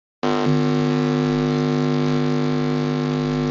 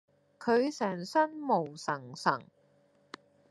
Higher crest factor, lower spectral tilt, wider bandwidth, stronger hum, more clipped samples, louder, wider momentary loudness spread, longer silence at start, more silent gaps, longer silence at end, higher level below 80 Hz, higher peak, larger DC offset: second, 12 dB vs 22 dB; first, -7.5 dB/octave vs -5 dB/octave; second, 7.4 kHz vs 12 kHz; first, 50 Hz at -25 dBFS vs none; neither; first, -20 LUFS vs -32 LUFS; second, 2 LU vs 23 LU; second, 0.25 s vs 0.4 s; neither; second, 0 s vs 1.05 s; first, -48 dBFS vs -86 dBFS; first, -8 dBFS vs -12 dBFS; neither